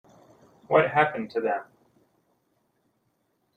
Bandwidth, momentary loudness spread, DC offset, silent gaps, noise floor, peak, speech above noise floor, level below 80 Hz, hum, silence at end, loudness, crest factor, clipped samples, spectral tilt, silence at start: 8.8 kHz; 9 LU; under 0.1%; none; -73 dBFS; -6 dBFS; 49 dB; -70 dBFS; none; 1.95 s; -25 LUFS; 24 dB; under 0.1%; -7.5 dB/octave; 0.7 s